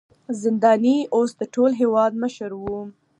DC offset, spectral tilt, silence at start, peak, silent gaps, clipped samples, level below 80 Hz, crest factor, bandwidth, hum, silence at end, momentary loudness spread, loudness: under 0.1%; -6 dB/octave; 0.3 s; -4 dBFS; none; under 0.1%; -58 dBFS; 16 dB; 10.5 kHz; none; 0.3 s; 13 LU; -21 LUFS